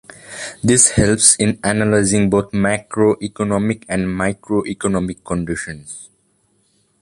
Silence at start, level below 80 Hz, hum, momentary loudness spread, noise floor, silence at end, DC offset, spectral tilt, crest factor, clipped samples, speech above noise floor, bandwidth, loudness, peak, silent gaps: 0.25 s; -40 dBFS; none; 18 LU; -61 dBFS; 0.95 s; under 0.1%; -4 dB/octave; 18 dB; under 0.1%; 45 dB; 11.5 kHz; -16 LUFS; 0 dBFS; none